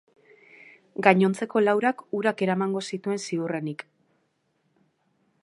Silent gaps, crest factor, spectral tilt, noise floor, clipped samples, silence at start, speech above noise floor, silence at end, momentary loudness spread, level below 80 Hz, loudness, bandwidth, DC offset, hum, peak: none; 26 dB; -6 dB/octave; -72 dBFS; under 0.1%; 1 s; 47 dB; 1.6 s; 11 LU; -78 dBFS; -25 LUFS; 11.5 kHz; under 0.1%; none; -2 dBFS